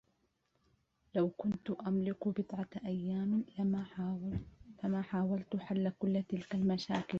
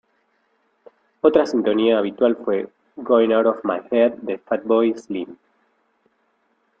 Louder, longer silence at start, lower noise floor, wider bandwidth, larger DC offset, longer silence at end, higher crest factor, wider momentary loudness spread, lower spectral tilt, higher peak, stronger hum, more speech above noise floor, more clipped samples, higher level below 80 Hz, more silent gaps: second, -37 LUFS vs -20 LUFS; about the same, 1.15 s vs 1.25 s; first, -78 dBFS vs -66 dBFS; about the same, 7 kHz vs 7.6 kHz; neither; second, 0 s vs 1.45 s; about the same, 16 dB vs 20 dB; second, 6 LU vs 13 LU; about the same, -7.5 dB/octave vs -6.5 dB/octave; second, -22 dBFS vs -2 dBFS; neither; second, 42 dB vs 48 dB; neither; about the same, -64 dBFS vs -64 dBFS; neither